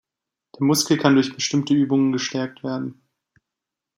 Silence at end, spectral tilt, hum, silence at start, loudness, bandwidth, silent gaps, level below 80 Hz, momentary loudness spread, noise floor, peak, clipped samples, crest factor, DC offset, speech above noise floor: 1.05 s; -4.5 dB/octave; none; 0.6 s; -21 LUFS; 16 kHz; none; -68 dBFS; 11 LU; -86 dBFS; -2 dBFS; under 0.1%; 20 dB; under 0.1%; 66 dB